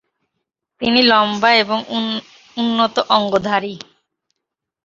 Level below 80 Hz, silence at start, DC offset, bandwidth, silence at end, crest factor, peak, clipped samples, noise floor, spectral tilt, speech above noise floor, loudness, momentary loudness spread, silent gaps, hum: -58 dBFS; 0.8 s; under 0.1%; 7.4 kHz; 1.05 s; 18 dB; 0 dBFS; under 0.1%; -80 dBFS; -4.5 dB/octave; 64 dB; -16 LUFS; 14 LU; none; none